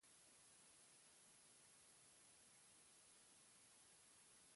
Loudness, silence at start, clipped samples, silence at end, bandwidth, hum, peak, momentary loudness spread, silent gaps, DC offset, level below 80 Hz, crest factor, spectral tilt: -68 LUFS; 0 s; under 0.1%; 0 s; 11.5 kHz; none; -58 dBFS; 0 LU; none; under 0.1%; under -90 dBFS; 14 dB; -0.5 dB/octave